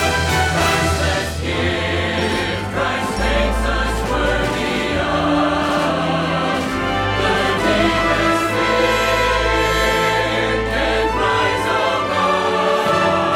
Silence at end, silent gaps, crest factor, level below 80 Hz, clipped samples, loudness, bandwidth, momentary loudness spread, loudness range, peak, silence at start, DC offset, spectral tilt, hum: 0 s; none; 14 dB; -30 dBFS; under 0.1%; -17 LUFS; 18.5 kHz; 4 LU; 3 LU; -4 dBFS; 0 s; under 0.1%; -4.5 dB/octave; none